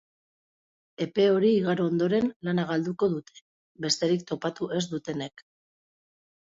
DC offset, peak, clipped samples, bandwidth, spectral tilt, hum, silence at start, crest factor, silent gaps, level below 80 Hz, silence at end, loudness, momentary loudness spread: under 0.1%; -12 dBFS; under 0.1%; 8 kHz; -5.5 dB/octave; none; 1 s; 18 dB; 2.36-2.40 s, 3.41-3.75 s; -68 dBFS; 1.1 s; -27 LUFS; 12 LU